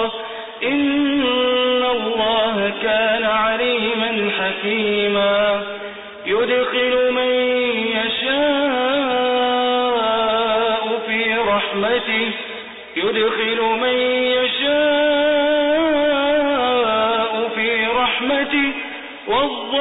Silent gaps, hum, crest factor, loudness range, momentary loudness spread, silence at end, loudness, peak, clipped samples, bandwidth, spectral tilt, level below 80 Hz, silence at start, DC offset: none; none; 10 dB; 2 LU; 5 LU; 0 s; -18 LUFS; -8 dBFS; under 0.1%; 4.1 kHz; -9 dB/octave; -54 dBFS; 0 s; under 0.1%